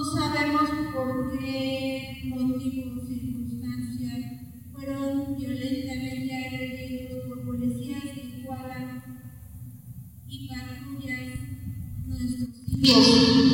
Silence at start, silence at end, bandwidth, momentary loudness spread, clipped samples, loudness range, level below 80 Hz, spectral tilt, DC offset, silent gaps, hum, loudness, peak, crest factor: 0 s; 0 s; 17 kHz; 17 LU; under 0.1%; 11 LU; -48 dBFS; -5 dB/octave; under 0.1%; none; none; -27 LUFS; -4 dBFS; 24 dB